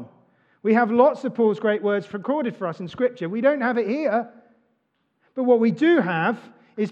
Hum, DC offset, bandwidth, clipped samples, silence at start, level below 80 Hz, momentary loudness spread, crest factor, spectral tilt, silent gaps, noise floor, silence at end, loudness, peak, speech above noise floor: none; under 0.1%; 7.6 kHz; under 0.1%; 0 s; -76 dBFS; 11 LU; 18 dB; -8 dB/octave; none; -71 dBFS; 0 s; -22 LUFS; -4 dBFS; 50 dB